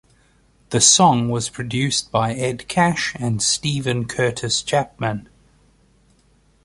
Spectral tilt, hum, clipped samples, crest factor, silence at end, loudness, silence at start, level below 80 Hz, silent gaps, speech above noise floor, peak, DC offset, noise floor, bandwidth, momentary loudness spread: -3 dB/octave; none; under 0.1%; 22 dB; 1.45 s; -19 LUFS; 0.7 s; -50 dBFS; none; 38 dB; 0 dBFS; under 0.1%; -57 dBFS; 11.5 kHz; 12 LU